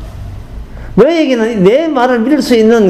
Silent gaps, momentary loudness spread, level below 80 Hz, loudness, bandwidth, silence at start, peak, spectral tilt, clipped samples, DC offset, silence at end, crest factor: none; 20 LU; -30 dBFS; -10 LUFS; 14.5 kHz; 0 s; 0 dBFS; -6.5 dB/octave; 0.7%; 0.3%; 0 s; 10 dB